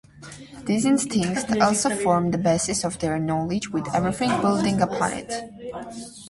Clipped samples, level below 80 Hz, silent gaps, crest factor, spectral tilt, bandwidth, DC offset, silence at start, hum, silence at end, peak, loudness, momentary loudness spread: under 0.1%; -52 dBFS; none; 20 dB; -5 dB/octave; 11.5 kHz; under 0.1%; 0.15 s; none; 0 s; -4 dBFS; -23 LUFS; 15 LU